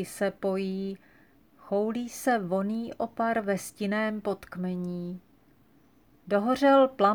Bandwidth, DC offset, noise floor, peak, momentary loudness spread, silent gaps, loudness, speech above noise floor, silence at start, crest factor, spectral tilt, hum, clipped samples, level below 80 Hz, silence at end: over 20 kHz; under 0.1%; -62 dBFS; -8 dBFS; 14 LU; none; -28 LUFS; 34 dB; 0 s; 20 dB; -6 dB/octave; none; under 0.1%; -68 dBFS; 0 s